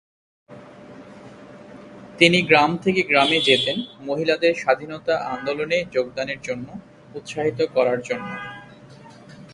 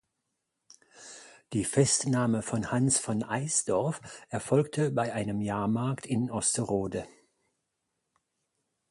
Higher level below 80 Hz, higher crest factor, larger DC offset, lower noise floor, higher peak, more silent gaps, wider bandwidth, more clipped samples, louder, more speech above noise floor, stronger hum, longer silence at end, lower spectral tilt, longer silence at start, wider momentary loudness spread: about the same, -60 dBFS vs -60 dBFS; about the same, 22 dB vs 20 dB; neither; second, -45 dBFS vs -82 dBFS; first, 0 dBFS vs -10 dBFS; neither; about the same, 11.5 kHz vs 11.5 kHz; neither; first, -20 LUFS vs -29 LUFS; second, 24 dB vs 54 dB; neither; second, 0 s vs 1.8 s; about the same, -4.5 dB/octave vs -4.5 dB/octave; second, 0.5 s vs 0.95 s; first, 22 LU vs 14 LU